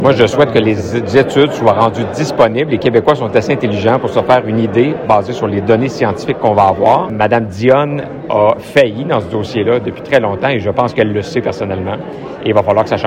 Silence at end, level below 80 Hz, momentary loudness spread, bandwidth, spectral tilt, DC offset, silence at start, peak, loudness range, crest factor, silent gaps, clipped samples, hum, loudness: 0 s; -44 dBFS; 7 LU; 15.5 kHz; -6.5 dB/octave; under 0.1%; 0 s; 0 dBFS; 3 LU; 12 dB; none; 0.3%; none; -13 LUFS